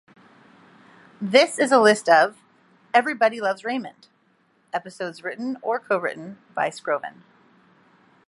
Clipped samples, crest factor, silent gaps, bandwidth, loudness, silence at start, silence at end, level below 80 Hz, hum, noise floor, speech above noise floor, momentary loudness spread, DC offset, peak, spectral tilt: under 0.1%; 22 dB; none; 11.5 kHz; -22 LUFS; 1.2 s; 1.2 s; -80 dBFS; none; -63 dBFS; 42 dB; 16 LU; under 0.1%; -2 dBFS; -3.5 dB/octave